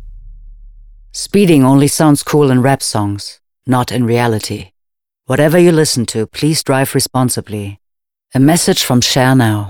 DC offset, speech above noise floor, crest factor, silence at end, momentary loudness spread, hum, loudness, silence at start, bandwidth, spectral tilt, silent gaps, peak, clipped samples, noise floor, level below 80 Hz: under 0.1%; 63 dB; 12 dB; 0 s; 15 LU; none; -12 LUFS; 0 s; 19 kHz; -5 dB/octave; none; 0 dBFS; under 0.1%; -75 dBFS; -42 dBFS